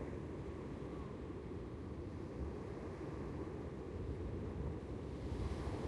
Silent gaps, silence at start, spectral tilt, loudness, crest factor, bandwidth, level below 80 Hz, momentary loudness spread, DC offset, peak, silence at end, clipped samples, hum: none; 0 s; -8 dB/octave; -46 LUFS; 14 dB; 11.5 kHz; -52 dBFS; 4 LU; under 0.1%; -30 dBFS; 0 s; under 0.1%; none